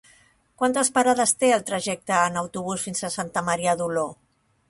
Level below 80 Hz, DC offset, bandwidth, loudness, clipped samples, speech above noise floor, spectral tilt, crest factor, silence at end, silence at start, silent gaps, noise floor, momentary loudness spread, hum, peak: -62 dBFS; under 0.1%; 12 kHz; -23 LUFS; under 0.1%; 35 dB; -3 dB/octave; 18 dB; 0.55 s; 0.6 s; none; -58 dBFS; 9 LU; none; -6 dBFS